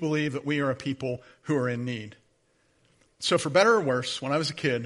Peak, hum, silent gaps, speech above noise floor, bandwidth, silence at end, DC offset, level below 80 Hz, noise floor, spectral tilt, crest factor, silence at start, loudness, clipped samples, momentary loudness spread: -6 dBFS; none; none; 41 dB; 11.5 kHz; 0 s; under 0.1%; -68 dBFS; -68 dBFS; -5 dB/octave; 22 dB; 0 s; -27 LUFS; under 0.1%; 13 LU